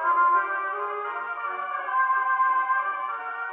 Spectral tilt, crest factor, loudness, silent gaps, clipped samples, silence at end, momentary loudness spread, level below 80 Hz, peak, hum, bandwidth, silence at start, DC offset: 2 dB/octave; 14 dB; -25 LUFS; none; under 0.1%; 0 s; 9 LU; under -90 dBFS; -12 dBFS; none; 3.9 kHz; 0 s; under 0.1%